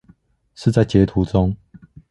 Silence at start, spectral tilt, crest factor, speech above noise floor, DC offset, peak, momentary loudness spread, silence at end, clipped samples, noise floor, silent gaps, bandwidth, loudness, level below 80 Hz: 0.6 s; -8 dB/octave; 18 dB; 38 dB; under 0.1%; -2 dBFS; 7 LU; 0.55 s; under 0.1%; -54 dBFS; none; 11.5 kHz; -18 LUFS; -36 dBFS